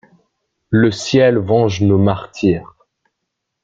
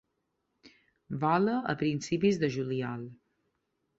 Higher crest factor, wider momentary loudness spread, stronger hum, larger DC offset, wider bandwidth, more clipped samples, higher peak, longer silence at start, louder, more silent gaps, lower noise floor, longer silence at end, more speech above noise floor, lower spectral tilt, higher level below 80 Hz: about the same, 16 dB vs 18 dB; second, 5 LU vs 13 LU; neither; neither; about the same, 7.8 kHz vs 8 kHz; neither; first, -2 dBFS vs -14 dBFS; about the same, 0.7 s vs 0.65 s; first, -15 LUFS vs -30 LUFS; neither; second, -76 dBFS vs -80 dBFS; first, 1 s vs 0.85 s; first, 62 dB vs 51 dB; about the same, -6.5 dB/octave vs -6.5 dB/octave; first, -48 dBFS vs -68 dBFS